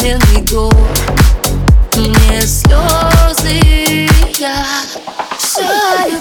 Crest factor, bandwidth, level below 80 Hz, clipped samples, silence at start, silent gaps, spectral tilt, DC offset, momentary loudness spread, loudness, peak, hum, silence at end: 10 dB; 19.5 kHz; -12 dBFS; under 0.1%; 0 s; none; -4.5 dB/octave; under 0.1%; 6 LU; -10 LUFS; 0 dBFS; none; 0 s